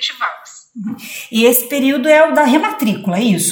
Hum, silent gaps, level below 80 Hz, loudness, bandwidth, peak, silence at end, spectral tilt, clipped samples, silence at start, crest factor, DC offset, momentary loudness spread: none; none; -68 dBFS; -13 LUFS; over 20 kHz; 0 dBFS; 0 s; -4 dB/octave; under 0.1%; 0 s; 14 dB; under 0.1%; 17 LU